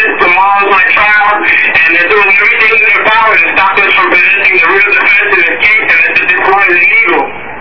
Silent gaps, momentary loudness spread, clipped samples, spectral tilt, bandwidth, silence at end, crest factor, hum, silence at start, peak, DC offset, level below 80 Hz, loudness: none; 2 LU; 2%; -4.5 dB/octave; 5.4 kHz; 0 s; 8 dB; none; 0 s; 0 dBFS; 4%; -42 dBFS; -5 LUFS